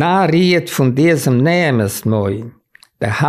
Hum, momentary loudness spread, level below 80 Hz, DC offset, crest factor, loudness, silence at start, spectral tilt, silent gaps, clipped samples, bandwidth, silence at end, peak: none; 10 LU; -52 dBFS; 0.1%; 12 dB; -14 LUFS; 0 s; -6 dB/octave; none; under 0.1%; 16 kHz; 0 s; -2 dBFS